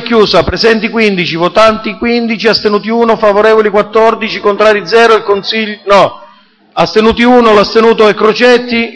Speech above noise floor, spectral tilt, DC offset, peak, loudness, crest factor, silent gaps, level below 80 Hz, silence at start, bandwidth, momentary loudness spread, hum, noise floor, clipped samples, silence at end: 35 dB; -5 dB/octave; under 0.1%; 0 dBFS; -8 LUFS; 8 dB; none; -36 dBFS; 0 s; 10 kHz; 6 LU; none; -42 dBFS; 2%; 0 s